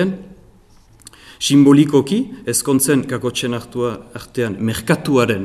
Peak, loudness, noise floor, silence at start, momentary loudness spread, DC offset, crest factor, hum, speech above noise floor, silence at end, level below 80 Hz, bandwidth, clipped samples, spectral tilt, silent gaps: 0 dBFS; -16 LUFS; -48 dBFS; 0 s; 12 LU; under 0.1%; 16 dB; none; 32 dB; 0 s; -50 dBFS; 15.5 kHz; under 0.1%; -5 dB/octave; none